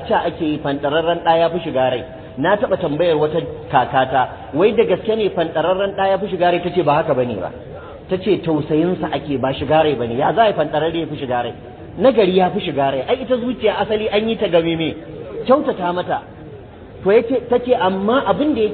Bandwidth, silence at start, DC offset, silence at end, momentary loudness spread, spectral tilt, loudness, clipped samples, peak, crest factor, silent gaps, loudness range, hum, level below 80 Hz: 4.5 kHz; 0 s; under 0.1%; 0 s; 9 LU; -11.5 dB/octave; -18 LUFS; under 0.1%; -2 dBFS; 16 dB; none; 2 LU; none; -46 dBFS